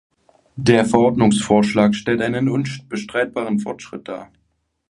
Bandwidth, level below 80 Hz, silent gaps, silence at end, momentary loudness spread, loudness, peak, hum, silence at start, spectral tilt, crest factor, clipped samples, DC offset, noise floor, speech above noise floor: 11.5 kHz; -52 dBFS; none; 0.65 s; 17 LU; -18 LUFS; 0 dBFS; none; 0.55 s; -6 dB/octave; 18 dB; under 0.1%; under 0.1%; -68 dBFS; 50 dB